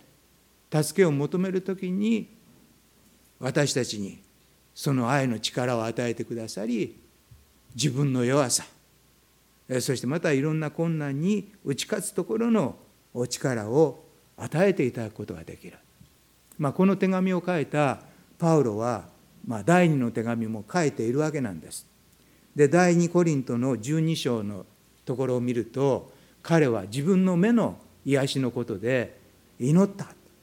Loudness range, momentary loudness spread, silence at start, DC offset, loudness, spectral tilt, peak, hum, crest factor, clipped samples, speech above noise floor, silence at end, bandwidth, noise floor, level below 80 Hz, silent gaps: 4 LU; 13 LU; 0.7 s; under 0.1%; -26 LUFS; -6 dB/octave; -6 dBFS; none; 20 dB; under 0.1%; 36 dB; 0.3 s; 16.5 kHz; -61 dBFS; -66 dBFS; none